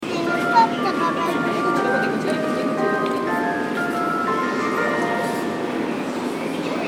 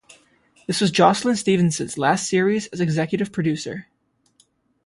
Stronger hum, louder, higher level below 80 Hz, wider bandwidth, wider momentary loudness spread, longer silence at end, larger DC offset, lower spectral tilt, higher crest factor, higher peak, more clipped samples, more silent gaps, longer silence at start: neither; about the same, -21 LUFS vs -20 LUFS; about the same, -64 dBFS vs -60 dBFS; first, 19 kHz vs 11.5 kHz; second, 6 LU vs 11 LU; second, 0 s vs 1.05 s; neither; about the same, -5 dB/octave vs -5 dB/octave; about the same, 18 dB vs 20 dB; about the same, -4 dBFS vs -2 dBFS; neither; neither; second, 0 s vs 0.7 s